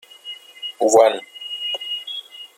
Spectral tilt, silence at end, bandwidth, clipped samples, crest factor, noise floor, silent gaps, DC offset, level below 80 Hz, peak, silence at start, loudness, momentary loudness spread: -1.5 dB/octave; 0.1 s; 15.5 kHz; under 0.1%; 20 dB; -39 dBFS; none; under 0.1%; -72 dBFS; -2 dBFS; 0.25 s; -19 LUFS; 20 LU